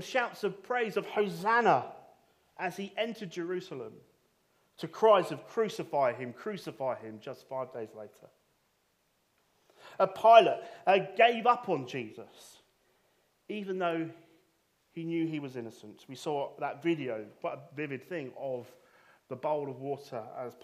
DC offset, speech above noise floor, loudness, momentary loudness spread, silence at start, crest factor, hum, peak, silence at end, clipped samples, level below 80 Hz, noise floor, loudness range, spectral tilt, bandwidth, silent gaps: under 0.1%; 43 dB; -31 LUFS; 20 LU; 0 s; 26 dB; none; -6 dBFS; 0.1 s; under 0.1%; -84 dBFS; -74 dBFS; 13 LU; -5.5 dB/octave; 14.5 kHz; none